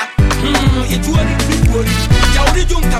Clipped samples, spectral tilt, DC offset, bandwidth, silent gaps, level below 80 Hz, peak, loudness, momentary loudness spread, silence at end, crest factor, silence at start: under 0.1%; -5 dB/octave; under 0.1%; 15.5 kHz; none; -14 dBFS; 0 dBFS; -13 LUFS; 3 LU; 0 s; 12 dB; 0 s